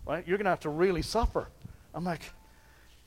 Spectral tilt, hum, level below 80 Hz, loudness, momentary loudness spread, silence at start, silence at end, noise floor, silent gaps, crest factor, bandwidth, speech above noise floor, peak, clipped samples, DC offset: -5.5 dB/octave; none; -42 dBFS; -31 LUFS; 18 LU; 0 s; 0.75 s; -58 dBFS; none; 18 dB; 16 kHz; 27 dB; -14 dBFS; under 0.1%; under 0.1%